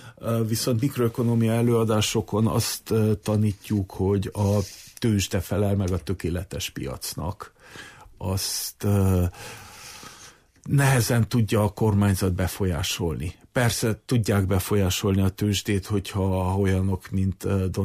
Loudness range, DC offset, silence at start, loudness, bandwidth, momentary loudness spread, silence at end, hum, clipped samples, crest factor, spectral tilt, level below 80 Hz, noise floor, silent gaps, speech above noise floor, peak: 5 LU; under 0.1%; 0 s; -24 LUFS; 15.5 kHz; 12 LU; 0 s; none; under 0.1%; 14 dB; -5.5 dB/octave; -46 dBFS; -50 dBFS; none; 26 dB; -10 dBFS